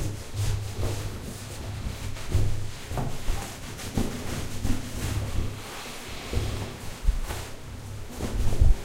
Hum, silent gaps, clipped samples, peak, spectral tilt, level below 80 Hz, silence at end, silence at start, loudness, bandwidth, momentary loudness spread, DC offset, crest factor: none; none; under 0.1%; -6 dBFS; -5 dB/octave; -30 dBFS; 0 s; 0 s; -33 LUFS; 16 kHz; 8 LU; under 0.1%; 20 dB